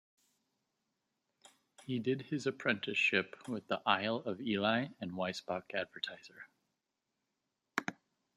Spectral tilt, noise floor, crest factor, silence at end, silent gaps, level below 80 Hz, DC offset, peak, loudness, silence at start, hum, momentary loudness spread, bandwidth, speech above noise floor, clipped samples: -5 dB/octave; -87 dBFS; 26 dB; 0.45 s; none; -82 dBFS; under 0.1%; -12 dBFS; -36 LUFS; 1.8 s; none; 12 LU; 14 kHz; 51 dB; under 0.1%